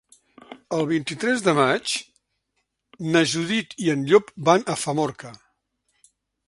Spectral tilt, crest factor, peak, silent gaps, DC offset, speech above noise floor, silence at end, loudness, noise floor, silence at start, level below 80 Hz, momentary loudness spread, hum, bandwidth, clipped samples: -4.5 dB/octave; 22 dB; -2 dBFS; none; under 0.1%; 54 dB; 1.15 s; -22 LUFS; -76 dBFS; 0.5 s; -66 dBFS; 10 LU; none; 11.5 kHz; under 0.1%